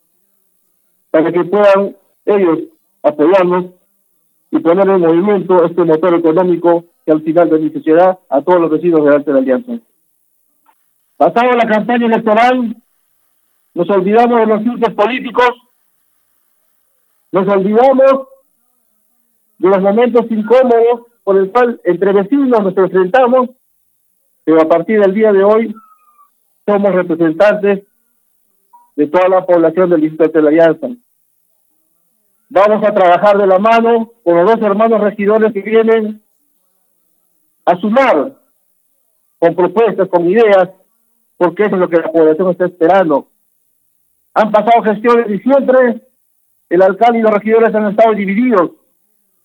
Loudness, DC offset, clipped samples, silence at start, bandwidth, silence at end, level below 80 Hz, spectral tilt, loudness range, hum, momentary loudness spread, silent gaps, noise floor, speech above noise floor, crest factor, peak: -11 LUFS; under 0.1%; under 0.1%; 1.15 s; 18 kHz; 0.75 s; -62 dBFS; -8 dB/octave; 3 LU; none; 8 LU; none; -59 dBFS; 49 dB; 12 dB; 0 dBFS